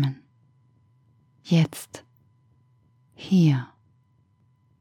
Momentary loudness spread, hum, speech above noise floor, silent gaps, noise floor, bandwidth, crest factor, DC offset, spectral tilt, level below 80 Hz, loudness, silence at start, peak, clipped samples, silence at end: 24 LU; none; 42 dB; none; -63 dBFS; 15.5 kHz; 18 dB; under 0.1%; -7 dB/octave; -72 dBFS; -23 LUFS; 0 s; -10 dBFS; under 0.1%; 1.15 s